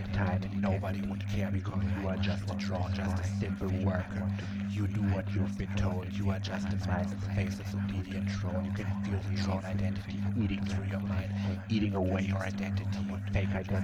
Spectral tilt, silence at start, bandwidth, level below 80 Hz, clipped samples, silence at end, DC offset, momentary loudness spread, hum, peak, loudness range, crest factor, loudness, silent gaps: -7.5 dB/octave; 0 s; 8.4 kHz; -48 dBFS; under 0.1%; 0 s; under 0.1%; 3 LU; none; -18 dBFS; 1 LU; 14 dB; -33 LUFS; none